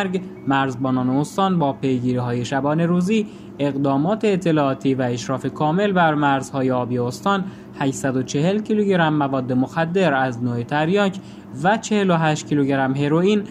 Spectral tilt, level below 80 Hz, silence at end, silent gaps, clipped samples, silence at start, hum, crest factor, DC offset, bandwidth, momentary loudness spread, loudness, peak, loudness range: -6.5 dB/octave; -58 dBFS; 0 s; none; under 0.1%; 0 s; none; 16 dB; under 0.1%; 13.5 kHz; 6 LU; -20 LUFS; -4 dBFS; 1 LU